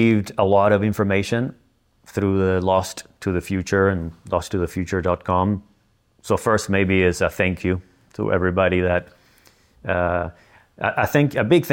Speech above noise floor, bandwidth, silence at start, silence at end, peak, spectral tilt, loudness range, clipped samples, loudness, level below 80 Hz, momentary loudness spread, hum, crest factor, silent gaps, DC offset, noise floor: 41 dB; 17 kHz; 0 s; 0 s; -4 dBFS; -6.5 dB/octave; 3 LU; under 0.1%; -21 LUFS; -46 dBFS; 10 LU; none; 16 dB; none; under 0.1%; -61 dBFS